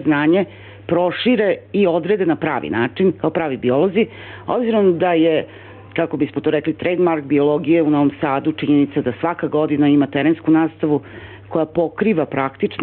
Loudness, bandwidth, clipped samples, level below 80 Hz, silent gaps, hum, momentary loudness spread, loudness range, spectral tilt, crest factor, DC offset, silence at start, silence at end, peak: -18 LUFS; 4.3 kHz; under 0.1%; -56 dBFS; none; none; 7 LU; 1 LU; -10.5 dB/octave; 12 dB; under 0.1%; 0 s; 0 s; -6 dBFS